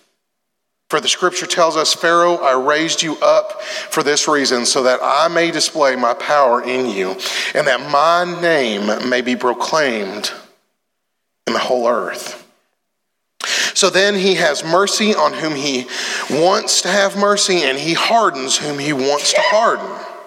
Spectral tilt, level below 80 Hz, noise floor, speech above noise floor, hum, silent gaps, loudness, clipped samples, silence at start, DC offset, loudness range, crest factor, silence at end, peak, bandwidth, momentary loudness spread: -2 dB/octave; -78 dBFS; -75 dBFS; 59 dB; none; none; -15 LUFS; under 0.1%; 0.9 s; under 0.1%; 5 LU; 14 dB; 0 s; -2 dBFS; 16.5 kHz; 7 LU